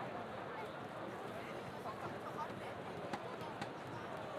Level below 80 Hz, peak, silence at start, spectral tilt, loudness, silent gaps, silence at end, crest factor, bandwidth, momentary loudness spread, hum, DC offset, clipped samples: -74 dBFS; -28 dBFS; 0 s; -5.5 dB/octave; -46 LUFS; none; 0 s; 18 dB; 15.5 kHz; 2 LU; none; under 0.1%; under 0.1%